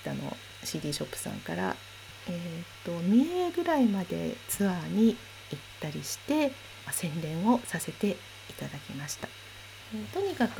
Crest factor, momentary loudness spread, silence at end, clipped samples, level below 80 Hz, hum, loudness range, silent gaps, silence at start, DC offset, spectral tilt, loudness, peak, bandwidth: 18 dB; 16 LU; 0 s; under 0.1%; -62 dBFS; none; 5 LU; none; 0 s; under 0.1%; -5 dB/octave; -31 LUFS; -14 dBFS; 20 kHz